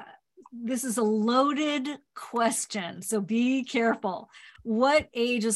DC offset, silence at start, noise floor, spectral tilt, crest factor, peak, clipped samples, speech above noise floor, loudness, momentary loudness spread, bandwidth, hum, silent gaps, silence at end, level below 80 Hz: under 0.1%; 0 s; -53 dBFS; -3.5 dB/octave; 16 dB; -10 dBFS; under 0.1%; 26 dB; -27 LUFS; 13 LU; 13 kHz; none; none; 0 s; -66 dBFS